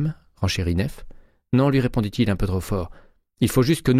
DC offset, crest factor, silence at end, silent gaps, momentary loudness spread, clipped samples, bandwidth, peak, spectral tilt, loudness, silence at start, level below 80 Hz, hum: under 0.1%; 16 dB; 0 s; none; 9 LU; under 0.1%; 16 kHz; -6 dBFS; -6.5 dB/octave; -23 LUFS; 0 s; -36 dBFS; none